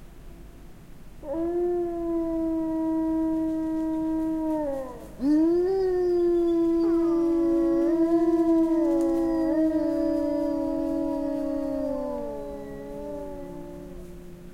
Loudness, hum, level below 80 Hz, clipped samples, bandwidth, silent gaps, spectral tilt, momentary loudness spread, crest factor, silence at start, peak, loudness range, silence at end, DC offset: -25 LUFS; none; -46 dBFS; under 0.1%; 9.8 kHz; none; -8 dB/octave; 15 LU; 12 dB; 0 s; -14 dBFS; 7 LU; 0 s; under 0.1%